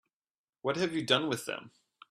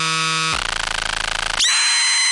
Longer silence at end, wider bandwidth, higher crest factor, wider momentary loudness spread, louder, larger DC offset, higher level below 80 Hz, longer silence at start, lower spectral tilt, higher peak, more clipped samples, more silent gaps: first, 0.45 s vs 0 s; first, 14.5 kHz vs 11.5 kHz; first, 24 dB vs 12 dB; first, 11 LU vs 7 LU; second, -31 LUFS vs -17 LUFS; neither; second, -74 dBFS vs -38 dBFS; first, 0.65 s vs 0 s; first, -4 dB/octave vs 0.5 dB/octave; second, -10 dBFS vs -6 dBFS; neither; neither